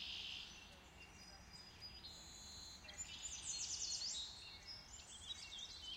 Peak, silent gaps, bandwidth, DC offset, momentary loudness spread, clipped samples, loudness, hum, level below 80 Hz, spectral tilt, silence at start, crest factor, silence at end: -32 dBFS; none; 16 kHz; under 0.1%; 15 LU; under 0.1%; -49 LUFS; none; -68 dBFS; 0 dB/octave; 0 s; 20 dB; 0 s